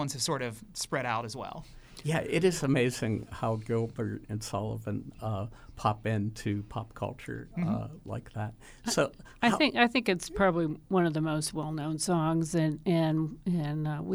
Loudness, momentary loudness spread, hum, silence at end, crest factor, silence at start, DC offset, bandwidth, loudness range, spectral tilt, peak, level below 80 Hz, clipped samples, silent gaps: -31 LUFS; 12 LU; none; 0 s; 20 dB; 0 s; under 0.1%; over 20 kHz; 6 LU; -5.5 dB/octave; -10 dBFS; -54 dBFS; under 0.1%; none